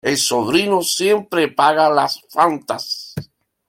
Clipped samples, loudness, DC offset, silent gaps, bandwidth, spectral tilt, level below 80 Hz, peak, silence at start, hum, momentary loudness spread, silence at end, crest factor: under 0.1%; -17 LUFS; under 0.1%; none; 16.5 kHz; -3 dB/octave; -60 dBFS; -2 dBFS; 0.05 s; none; 10 LU; 0.45 s; 16 dB